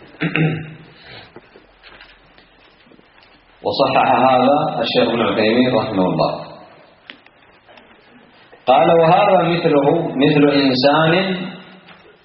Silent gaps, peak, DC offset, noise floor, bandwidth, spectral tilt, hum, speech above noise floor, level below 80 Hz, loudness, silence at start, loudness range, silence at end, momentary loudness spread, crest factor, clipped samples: none; 0 dBFS; under 0.1%; -49 dBFS; 5.8 kHz; -4 dB/octave; none; 35 dB; -56 dBFS; -15 LUFS; 0.2 s; 10 LU; 0.6 s; 13 LU; 16 dB; under 0.1%